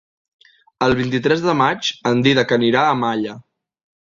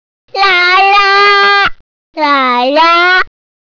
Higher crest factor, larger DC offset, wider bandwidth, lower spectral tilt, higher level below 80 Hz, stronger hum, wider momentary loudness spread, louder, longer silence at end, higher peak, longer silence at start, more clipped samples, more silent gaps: first, 18 dB vs 8 dB; neither; first, 7.6 kHz vs 5.4 kHz; first, -5.5 dB/octave vs -2 dB/octave; second, -52 dBFS vs -42 dBFS; neither; second, 6 LU vs 9 LU; second, -17 LUFS vs -7 LUFS; first, 0.75 s vs 0.35 s; about the same, -2 dBFS vs -2 dBFS; first, 0.8 s vs 0.35 s; neither; second, none vs 1.80-2.13 s